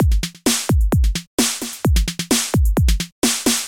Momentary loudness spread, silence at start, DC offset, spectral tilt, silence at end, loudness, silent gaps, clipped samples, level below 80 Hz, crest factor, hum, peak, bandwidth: 3 LU; 0 s; under 0.1%; -4 dB/octave; 0 s; -19 LUFS; 1.27-1.38 s, 3.12-3.22 s; under 0.1%; -20 dBFS; 14 dB; none; -4 dBFS; 17 kHz